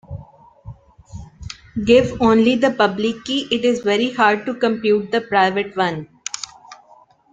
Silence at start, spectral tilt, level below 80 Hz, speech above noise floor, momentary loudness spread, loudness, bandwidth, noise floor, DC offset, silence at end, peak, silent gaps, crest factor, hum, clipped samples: 0.1 s; -4.5 dB/octave; -48 dBFS; 34 dB; 21 LU; -18 LUFS; 9.4 kHz; -51 dBFS; under 0.1%; 0.6 s; -2 dBFS; none; 18 dB; none; under 0.1%